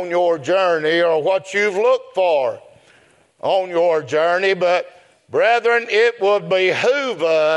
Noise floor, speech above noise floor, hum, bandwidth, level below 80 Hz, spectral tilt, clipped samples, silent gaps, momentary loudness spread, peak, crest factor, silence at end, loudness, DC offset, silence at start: -53 dBFS; 36 dB; none; 11.5 kHz; -74 dBFS; -4 dB/octave; under 0.1%; none; 5 LU; -4 dBFS; 14 dB; 0 s; -17 LUFS; under 0.1%; 0 s